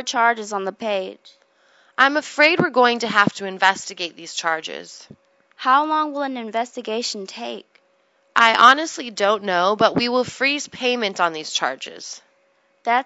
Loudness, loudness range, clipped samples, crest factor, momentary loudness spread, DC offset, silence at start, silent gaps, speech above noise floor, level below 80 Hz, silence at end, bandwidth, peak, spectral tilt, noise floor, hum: -19 LUFS; 6 LU; under 0.1%; 20 dB; 16 LU; under 0.1%; 0 s; none; 42 dB; -68 dBFS; 0 s; 11 kHz; 0 dBFS; -3 dB/octave; -62 dBFS; none